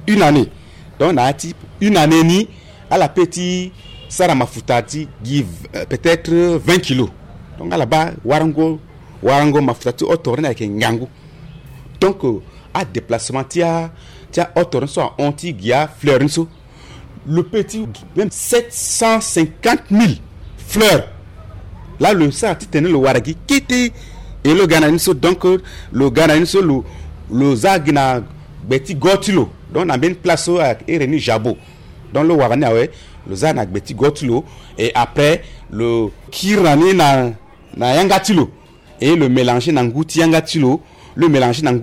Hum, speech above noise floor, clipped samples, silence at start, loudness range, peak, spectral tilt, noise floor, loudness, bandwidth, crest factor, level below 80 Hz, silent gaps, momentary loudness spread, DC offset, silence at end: none; 23 dB; under 0.1%; 0 s; 4 LU; -4 dBFS; -5 dB/octave; -37 dBFS; -15 LUFS; 16 kHz; 12 dB; -40 dBFS; none; 12 LU; under 0.1%; 0 s